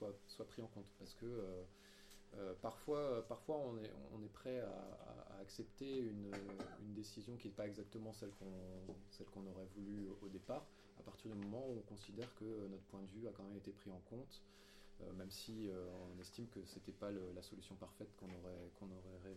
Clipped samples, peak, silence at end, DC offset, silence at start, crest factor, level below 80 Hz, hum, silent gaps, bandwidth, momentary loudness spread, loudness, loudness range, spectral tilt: under 0.1%; -32 dBFS; 0 s; under 0.1%; 0 s; 20 dB; -70 dBFS; none; none; 16 kHz; 11 LU; -52 LUFS; 6 LU; -6 dB/octave